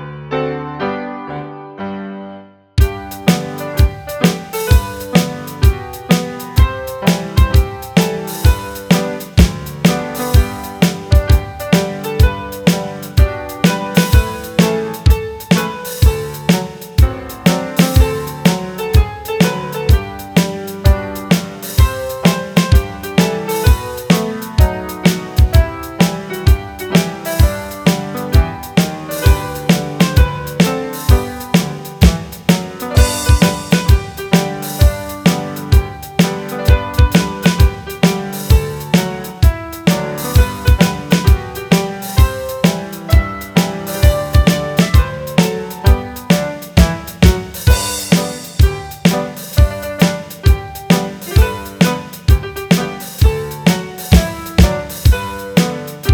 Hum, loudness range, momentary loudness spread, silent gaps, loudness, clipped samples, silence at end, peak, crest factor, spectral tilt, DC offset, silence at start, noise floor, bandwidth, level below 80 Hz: none; 2 LU; 7 LU; none; -15 LUFS; 0.2%; 0 s; 0 dBFS; 14 dB; -5.5 dB/octave; under 0.1%; 0 s; -36 dBFS; over 20 kHz; -18 dBFS